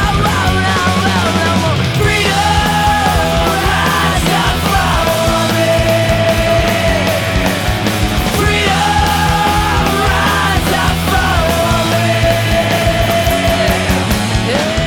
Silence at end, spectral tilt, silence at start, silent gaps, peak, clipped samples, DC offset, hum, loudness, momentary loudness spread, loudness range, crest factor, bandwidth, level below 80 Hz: 0 s; -4.5 dB/octave; 0 s; none; -2 dBFS; under 0.1%; under 0.1%; none; -12 LUFS; 2 LU; 1 LU; 10 dB; over 20 kHz; -22 dBFS